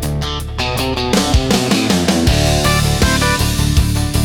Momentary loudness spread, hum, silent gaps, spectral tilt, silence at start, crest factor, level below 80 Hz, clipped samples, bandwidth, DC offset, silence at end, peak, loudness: 6 LU; none; none; -4.5 dB/octave; 0 s; 12 dB; -22 dBFS; under 0.1%; 18 kHz; under 0.1%; 0 s; -2 dBFS; -15 LUFS